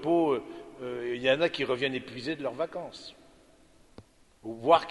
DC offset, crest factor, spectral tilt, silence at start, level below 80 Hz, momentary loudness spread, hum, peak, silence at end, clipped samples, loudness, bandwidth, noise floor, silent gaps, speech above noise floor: under 0.1%; 22 dB; -5.5 dB/octave; 0 s; -66 dBFS; 18 LU; none; -8 dBFS; 0 s; under 0.1%; -30 LUFS; 11.5 kHz; -59 dBFS; none; 30 dB